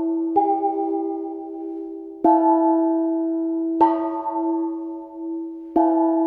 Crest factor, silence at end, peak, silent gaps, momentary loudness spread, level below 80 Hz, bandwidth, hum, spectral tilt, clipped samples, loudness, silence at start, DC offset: 18 dB; 0 s; -4 dBFS; none; 14 LU; -64 dBFS; 3.2 kHz; none; -9 dB/octave; under 0.1%; -22 LUFS; 0 s; under 0.1%